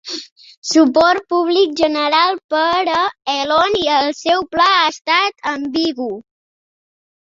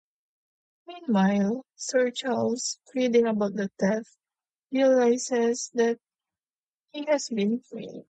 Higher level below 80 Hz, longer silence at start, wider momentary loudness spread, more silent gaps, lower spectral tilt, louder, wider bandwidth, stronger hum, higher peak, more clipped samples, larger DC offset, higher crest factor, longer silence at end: first, -54 dBFS vs -74 dBFS; second, 0.05 s vs 0.9 s; about the same, 10 LU vs 11 LU; second, 0.32-0.36 s, 0.57-0.62 s, 2.44-2.49 s, 5.01-5.05 s vs 4.55-4.68 s, 6.50-6.86 s; second, -2.5 dB/octave vs -5 dB/octave; first, -15 LUFS vs -26 LUFS; second, 7.8 kHz vs 9.2 kHz; neither; first, -2 dBFS vs -10 dBFS; neither; neither; about the same, 16 dB vs 16 dB; first, 1 s vs 0.1 s